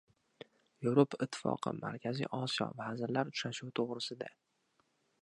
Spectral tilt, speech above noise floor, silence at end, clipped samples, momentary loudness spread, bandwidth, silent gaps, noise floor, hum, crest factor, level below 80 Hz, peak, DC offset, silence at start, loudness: -5.5 dB/octave; 41 dB; 0.9 s; under 0.1%; 17 LU; 11 kHz; none; -77 dBFS; none; 24 dB; -80 dBFS; -14 dBFS; under 0.1%; 0.8 s; -37 LUFS